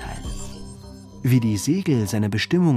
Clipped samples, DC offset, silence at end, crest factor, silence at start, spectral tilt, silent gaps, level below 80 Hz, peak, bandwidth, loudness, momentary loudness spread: under 0.1%; under 0.1%; 0 s; 14 dB; 0 s; -6 dB/octave; none; -40 dBFS; -8 dBFS; 15.5 kHz; -22 LUFS; 20 LU